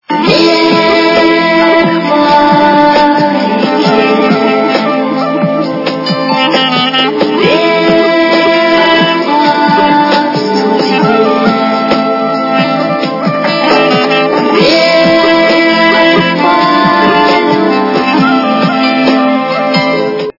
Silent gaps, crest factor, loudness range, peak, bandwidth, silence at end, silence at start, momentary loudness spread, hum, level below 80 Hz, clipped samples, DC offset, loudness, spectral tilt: none; 8 dB; 3 LU; 0 dBFS; 6 kHz; 0.1 s; 0.1 s; 5 LU; none; -48 dBFS; 0.8%; under 0.1%; -8 LUFS; -5.5 dB/octave